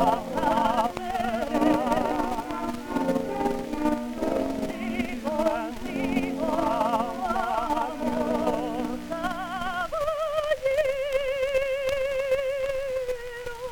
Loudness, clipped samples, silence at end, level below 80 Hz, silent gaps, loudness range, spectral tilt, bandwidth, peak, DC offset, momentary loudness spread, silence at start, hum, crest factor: -27 LUFS; under 0.1%; 0 s; -44 dBFS; none; 2 LU; -5 dB/octave; over 20 kHz; -10 dBFS; under 0.1%; 6 LU; 0 s; none; 18 dB